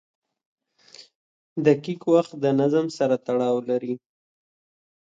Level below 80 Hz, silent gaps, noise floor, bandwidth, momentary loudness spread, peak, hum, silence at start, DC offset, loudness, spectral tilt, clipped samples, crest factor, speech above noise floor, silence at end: -72 dBFS; 1.15-1.56 s; -51 dBFS; 7.8 kHz; 8 LU; -4 dBFS; none; 1 s; under 0.1%; -23 LUFS; -7 dB/octave; under 0.1%; 20 dB; 29 dB; 1.05 s